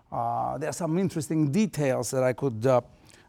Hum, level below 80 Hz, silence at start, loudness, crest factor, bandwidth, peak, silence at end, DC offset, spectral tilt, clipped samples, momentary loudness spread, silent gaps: none; -60 dBFS; 0.1 s; -27 LUFS; 16 dB; 17.5 kHz; -10 dBFS; 0.45 s; under 0.1%; -6.5 dB/octave; under 0.1%; 5 LU; none